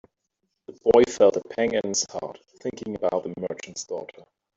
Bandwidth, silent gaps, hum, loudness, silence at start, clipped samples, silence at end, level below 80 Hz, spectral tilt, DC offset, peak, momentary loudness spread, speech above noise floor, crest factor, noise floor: 8 kHz; none; none; -24 LUFS; 0.7 s; under 0.1%; 0.5 s; -60 dBFS; -3.5 dB/octave; under 0.1%; -4 dBFS; 17 LU; 54 dB; 22 dB; -78 dBFS